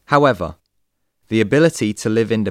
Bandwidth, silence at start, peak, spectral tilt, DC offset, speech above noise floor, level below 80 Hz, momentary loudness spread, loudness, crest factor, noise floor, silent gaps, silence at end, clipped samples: 15 kHz; 0.1 s; 0 dBFS; -6 dB/octave; under 0.1%; 53 dB; -48 dBFS; 9 LU; -17 LUFS; 18 dB; -70 dBFS; none; 0 s; under 0.1%